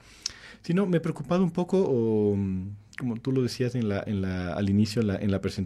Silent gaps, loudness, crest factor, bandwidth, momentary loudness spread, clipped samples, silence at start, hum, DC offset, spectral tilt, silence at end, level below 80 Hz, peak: none; -27 LUFS; 16 dB; 13 kHz; 10 LU; under 0.1%; 0.25 s; none; under 0.1%; -7 dB/octave; 0 s; -56 dBFS; -12 dBFS